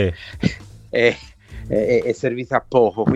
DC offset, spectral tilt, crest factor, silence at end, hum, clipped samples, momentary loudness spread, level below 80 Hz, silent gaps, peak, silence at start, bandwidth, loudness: under 0.1%; -6.5 dB/octave; 18 dB; 0 s; none; under 0.1%; 17 LU; -42 dBFS; none; -2 dBFS; 0 s; 9.2 kHz; -20 LUFS